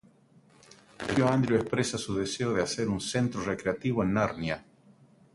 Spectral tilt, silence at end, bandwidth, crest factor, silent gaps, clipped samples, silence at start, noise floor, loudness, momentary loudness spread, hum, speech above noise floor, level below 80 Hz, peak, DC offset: -5.5 dB/octave; 0.7 s; 11.5 kHz; 18 dB; none; under 0.1%; 1 s; -60 dBFS; -29 LUFS; 7 LU; none; 32 dB; -56 dBFS; -12 dBFS; under 0.1%